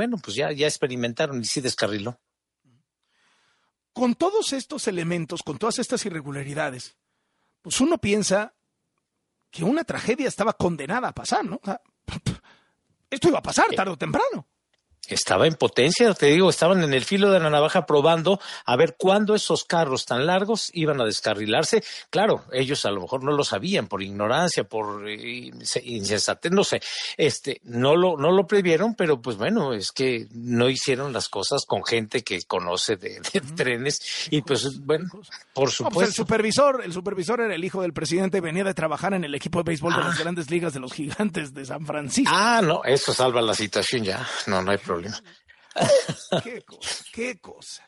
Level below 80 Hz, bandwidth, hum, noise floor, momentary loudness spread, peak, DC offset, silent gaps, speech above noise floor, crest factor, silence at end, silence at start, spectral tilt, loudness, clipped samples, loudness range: -60 dBFS; 11.5 kHz; none; -78 dBFS; 12 LU; -6 dBFS; under 0.1%; none; 54 dB; 18 dB; 0.1 s; 0 s; -4 dB/octave; -23 LUFS; under 0.1%; 7 LU